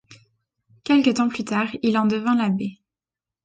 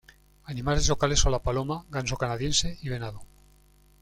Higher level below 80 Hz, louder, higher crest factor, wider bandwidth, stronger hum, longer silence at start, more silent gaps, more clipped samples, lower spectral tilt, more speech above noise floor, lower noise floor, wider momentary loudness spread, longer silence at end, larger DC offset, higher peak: second, -64 dBFS vs -34 dBFS; first, -21 LUFS vs -27 LUFS; about the same, 18 dB vs 20 dB; second, 9 kHz vs 14 kHz; second, none vs 50 Hz at -45 dBFS; second, 0.1 s vs 0.45 s; neither; neither; first, -5.5 dB/octave vs -3.5 dB/octave; first, 69 dB vs 32 dB; first, -90 dBFS vs -58 dBFS; second, 9 LU vs 12 LU; about the same, 0.7 s vs 0.75 s; neither; about the same, -6 dBFS vs -8 dBFS